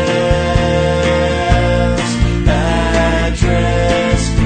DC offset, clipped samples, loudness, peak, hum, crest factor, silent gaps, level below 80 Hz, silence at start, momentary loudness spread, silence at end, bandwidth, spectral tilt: under 0.1%; under 0.1%; -14 LUFS; 0 dBFS; none; 12 dB; none; -18 dBFS; 0 s; 1 LU; 0 s; 9.4 kHz; -6 dB/octave